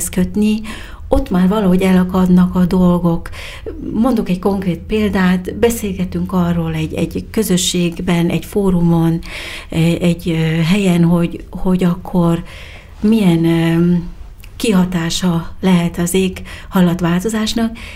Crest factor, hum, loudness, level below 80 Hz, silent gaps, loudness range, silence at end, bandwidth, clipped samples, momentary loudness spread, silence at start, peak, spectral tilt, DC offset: 14 dB; none; -15 LUFS; -32 dBFS; none; 3 LU; 0 s; 16 kHz; under 0.1%; 9 LU; 0 s; 0 dBFS; -6 dB/octave; under 0.1%